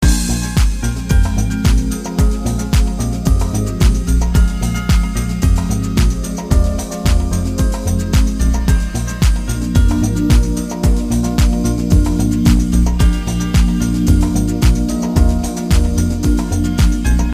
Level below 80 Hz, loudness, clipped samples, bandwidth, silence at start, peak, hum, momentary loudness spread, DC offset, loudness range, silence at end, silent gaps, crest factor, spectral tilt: -16 dBFS; -16 LUFS; under 0.1%; 15.5 kHz; 0 s; 0 dBFS; none; 5 LU; under 0.1%; 2 LU; 0 s; none; 14 dB; -6 dB/octave